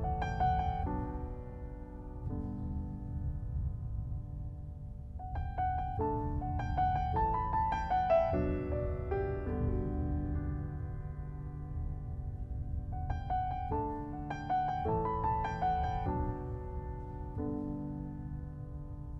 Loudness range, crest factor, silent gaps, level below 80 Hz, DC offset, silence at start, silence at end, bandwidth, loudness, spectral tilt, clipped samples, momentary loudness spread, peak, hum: 8 LU; 18 dB; none; -42 dBFS; under 0.1%; 0 s; 0 s; 6 kHz; -36 LUFS; -9 dB/octave; under 0.1%; 11 LU; -18 dBFS; none